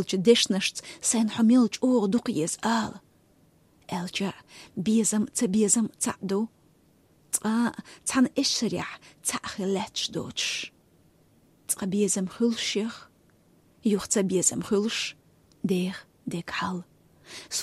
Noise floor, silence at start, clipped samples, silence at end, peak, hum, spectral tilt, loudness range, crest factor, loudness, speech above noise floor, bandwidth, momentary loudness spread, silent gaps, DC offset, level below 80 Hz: -62 dBFS; 0 s; under 0.1%; 0 s; -6 dBFS; none; -3.5 dB/octave; 4 LU; 20 dB; -26 LUFS; 35 dB; 15 kHz; 14 LU; none; under 0.1%; -66 dBFS